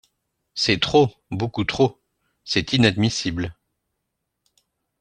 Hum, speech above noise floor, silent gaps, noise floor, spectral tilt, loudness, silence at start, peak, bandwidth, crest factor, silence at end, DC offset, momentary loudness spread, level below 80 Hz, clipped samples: none; 58 dB; none; -78 dBFS; -5 dB/octave; -21 LUFS; 0.55 s; -2 dBFS; 9.8 kHz; 20 dB; 1.5 s; under 0.1%; 11 LU; -50 dBFS; under 0.1%